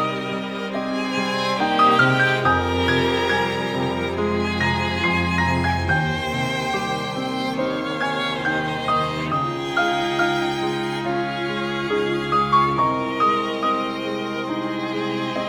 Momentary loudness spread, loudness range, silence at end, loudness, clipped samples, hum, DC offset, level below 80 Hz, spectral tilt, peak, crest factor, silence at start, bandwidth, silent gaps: 8 LU; 4 LU; 0 s; -21 LUFS; under 0.1%; none; under 0.1%; -46 dBFS; -5.5 dB/octave; -4 dBFS; 18 dB; 0 s; 19.5 kHz; none